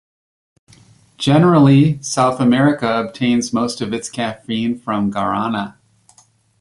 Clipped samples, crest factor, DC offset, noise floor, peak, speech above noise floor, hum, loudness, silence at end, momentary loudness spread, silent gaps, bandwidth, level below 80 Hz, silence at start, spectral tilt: under 0.1%; 16 dB; under 0.1%; -54 dBFS; -2 dBFS; 38 dB; none; -16 LUFS; 0.9 s; 12 LU; none; 11.5 kHz; -54 dBFS; 1.2 s; -6 dB/octave